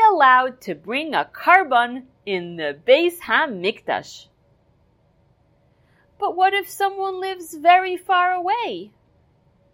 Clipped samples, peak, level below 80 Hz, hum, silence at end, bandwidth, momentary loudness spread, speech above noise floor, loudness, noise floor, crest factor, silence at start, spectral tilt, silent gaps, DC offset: under 0.1%; 0 dBFS; -66 dBFS; none; 0.85 s; 16 kHz; 14 LU; 40 dB; -19 LUFS; -60 dBFS; 20 dB; 0 s; -3.5 dB/octave; none; under 0.1%